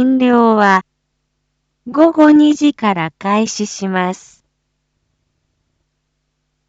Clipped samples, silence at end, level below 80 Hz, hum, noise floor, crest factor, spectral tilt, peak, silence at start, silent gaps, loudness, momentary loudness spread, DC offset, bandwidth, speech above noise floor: under 0.1%; 2.5 s; -62 dBFS; none; -69 dBFS; 14 dB; -5 dB/octave; 0 dBFS; 0 s; none; -13 LUFS; 12 LU; under 0.1%; 8 kHz; 57 dB